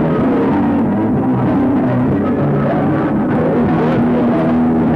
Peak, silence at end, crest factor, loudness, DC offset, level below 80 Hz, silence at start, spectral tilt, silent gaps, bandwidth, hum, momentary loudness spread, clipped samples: -6 dBFS; 0 s; 8 dB; -14 LUFS; under 0.1%; -38 dBFS; 0 s; -10 dB/octave; none; 5 kHz; none; 2 LU; under 0.1%